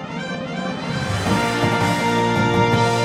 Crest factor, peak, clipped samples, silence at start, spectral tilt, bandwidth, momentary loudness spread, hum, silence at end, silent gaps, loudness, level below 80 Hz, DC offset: 16 dB; -4 dBFS; under 0.1%; 0 s; -5.5 dB/octave; 16 kHz; 9 LU; none; 0 s; none; -20 LUFS; -44 dBFS; under 0.1%